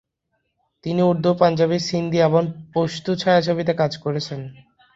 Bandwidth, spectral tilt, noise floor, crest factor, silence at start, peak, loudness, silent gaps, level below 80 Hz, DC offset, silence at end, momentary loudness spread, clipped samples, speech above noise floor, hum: 7.8 kHz; -6.5 dB/octave; -73 dBFS; 18 dB; 0.85 s; -2 dBFS; -20 LUFS; none; -58 dBFS; under 0.1%; 0.45 s; 10 LU; under 0.1%; 54 dB; none